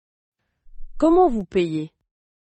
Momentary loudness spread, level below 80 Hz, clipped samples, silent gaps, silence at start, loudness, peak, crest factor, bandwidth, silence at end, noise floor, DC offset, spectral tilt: 13 LU; -42 dBFS; under 0.1%; none; 0.75 s; -20 LUFS; -6 dBFS; 16 dB; 8.6 kHz; 0.65 s; -39 dBFS; under 0.1%; -7.5 dB/octave